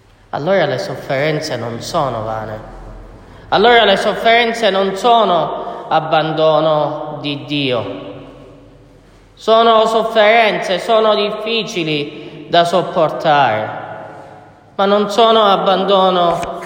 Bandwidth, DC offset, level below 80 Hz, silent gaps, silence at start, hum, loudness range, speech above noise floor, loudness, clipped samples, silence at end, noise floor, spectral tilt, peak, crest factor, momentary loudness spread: 16.5 kHz; under 0.1%; -46 dBFS; none; 0.35 s; none; 5 LU; 31 dB; -14 LUFS; under 0.1%; 0 s; -44 dBFS; -5 dB/octave; 0 dBFS; 14 dB; 16 LU